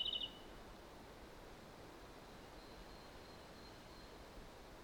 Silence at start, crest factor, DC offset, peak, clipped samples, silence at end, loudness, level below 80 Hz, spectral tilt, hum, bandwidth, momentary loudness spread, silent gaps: 0 s; 20 dB; under 0.1%; -32 dBFS; under 0.1%; 0 s; -53 LUFS; -64 dBFS; -3.5 dB/octave; none; over 20 kHz; 8 LU; none